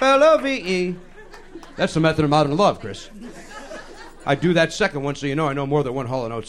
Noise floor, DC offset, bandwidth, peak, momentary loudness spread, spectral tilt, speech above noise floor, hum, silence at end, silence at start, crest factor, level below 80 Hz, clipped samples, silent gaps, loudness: -40 dBFS; under 0.1%; 12 kHz; -4 dBFS; 22 LU; -5.5 dB/octave; 19 dB; none; 0 s; 0 s; 16 dB; -44 dBFS; under 0.1%; none; -20 LUFS